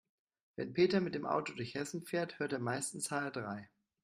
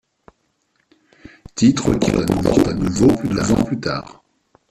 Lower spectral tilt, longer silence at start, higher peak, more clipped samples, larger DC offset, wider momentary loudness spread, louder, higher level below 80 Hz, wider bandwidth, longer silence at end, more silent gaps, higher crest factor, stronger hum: second, -4.5 dB/octave vs -6 dB/octave; second, 0.6 s vs 1.55 s; second, -18 dBFS vs -2 dBFS; neither; neither; first, 13 LU vs 8 LU; second, -37 LUFS vs -17 LUFS; second, -76 dBFS vs -38 dBFS; about the same, 15 kHz vs 14 kHz; second, 0.35 s vs 0.6 s; neither; about the same, 20 dB vs 16 dB; neither